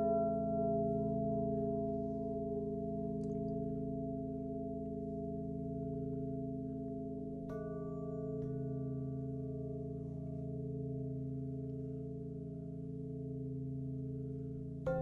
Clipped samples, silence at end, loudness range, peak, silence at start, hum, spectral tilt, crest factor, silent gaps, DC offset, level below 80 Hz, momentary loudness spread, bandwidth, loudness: under 0.1%; 0 s; 5 LU; -24 dBFS; 0 s; none; -12 dB/octave; 16 dB; none; under 0.1%; -56 dBFS; 8 LU; 3.4 kHz; -41 LUFS